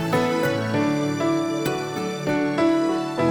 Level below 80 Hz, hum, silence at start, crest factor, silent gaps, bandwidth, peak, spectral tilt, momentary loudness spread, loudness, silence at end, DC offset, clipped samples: -54 dBFS; none; 0 s; 14 dB; none; 19.5 kHz; -8 dBFS; -6 dB/octave; 5 LU; -23 LUFS; 0 s; under 0.1%; under 0.1%